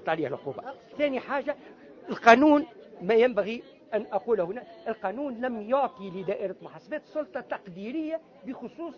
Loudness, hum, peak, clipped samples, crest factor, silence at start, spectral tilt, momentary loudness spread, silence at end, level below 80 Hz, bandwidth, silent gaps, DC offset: -27 LUFS; none; -2 dBFS; under 0.1%; 26 dB; 0 s; -6 dB/octave; 17 LU; 0 s; -68 dBFS; 7.2 kHz; none; under 0.1%